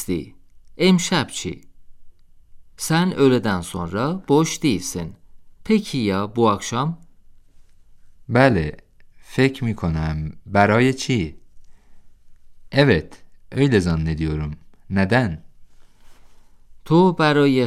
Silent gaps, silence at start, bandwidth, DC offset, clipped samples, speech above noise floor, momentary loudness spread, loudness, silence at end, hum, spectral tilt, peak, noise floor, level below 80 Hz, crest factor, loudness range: none; 0 s; 15 kHz; under 0.1%; under 0.1%; 28 dB; 14 LU; -20 LUFS; 0 s; none; -5.5 dB/octave; -2 dBFS; -47 dBFS; -44 dBFS; 20 dB; 2 LU